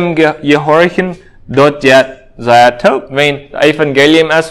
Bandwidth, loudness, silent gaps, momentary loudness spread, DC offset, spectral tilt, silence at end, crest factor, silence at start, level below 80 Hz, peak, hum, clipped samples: 16 kHz; -9 LUFS; none; 10 LU; under 0.1%; -5 dB/octave; 0 s; 10 dB; 0 s; -44 dBFS; 0 dBFS; none; 2%